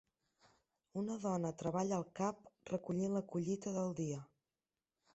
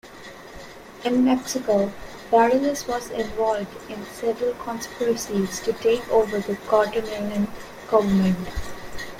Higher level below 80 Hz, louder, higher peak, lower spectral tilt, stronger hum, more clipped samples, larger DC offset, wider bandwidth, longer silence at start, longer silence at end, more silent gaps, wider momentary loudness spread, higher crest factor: second, -76 dBFS vs -46 dBFS; second, -41 LUFS vs -23 LUFS; second, -26 dBFS vs -6 dBFS; first, -8 dB/octave vs -5.5 dB/octave; neither; neither; neither; second, 8 kHz vs 16.5 kHz; first, 0.95 s vs 0.05 s; first, 0.9 s vs 0 s; neither; second, 6 LU vs 17 LU; about the same, 16 dB vs 18 dB